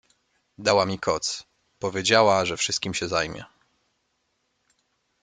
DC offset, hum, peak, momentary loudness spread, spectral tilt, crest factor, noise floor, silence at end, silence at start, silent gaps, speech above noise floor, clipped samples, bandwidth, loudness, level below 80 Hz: under 0.1%; none; -4 dBFS; 13 LU; -3 dB/octave; 22 dB; -73 dBFS; 1.75 s; 0.6 s; none; 50 dB; under 0.1%; 9.6 kHz; -23 LUFS; -60 dBFS